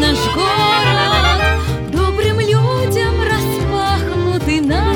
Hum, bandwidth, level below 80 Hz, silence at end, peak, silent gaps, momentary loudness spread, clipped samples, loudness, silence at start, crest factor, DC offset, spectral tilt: none; over 20 kHz; -24 dBFS; 0 s; -2 dBFS; none; 5 LU; under 0.1%; -15 LUFS; 0 s; 14 dB; under 0.1%; -5.5 dB/octave